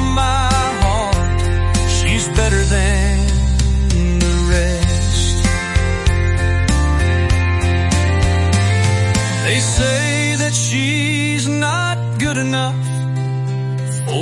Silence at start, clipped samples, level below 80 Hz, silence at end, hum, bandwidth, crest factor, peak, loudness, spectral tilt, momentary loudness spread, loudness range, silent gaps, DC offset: 0 s; under 0.1%; -20 dBFS; 0 s; none; 11.5 kHz; 12 dB; -2 dBFS; -16 LUFS; -4.5 dB/octave; 4 LU; 2 LU; none; under 0.1%